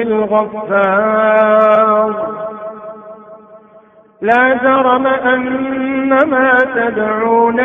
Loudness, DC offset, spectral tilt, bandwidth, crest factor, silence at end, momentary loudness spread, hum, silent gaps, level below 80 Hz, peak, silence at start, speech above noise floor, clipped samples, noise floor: -12 LUFS; under 0.1%; -7.5 dB/octave; 3.8 kHz; 14 dB; 0 s; 14 LU; none; none; -54 dBFS; 0 dBFS; 0 s; 32 dB; under 0.1%; -44 dBFS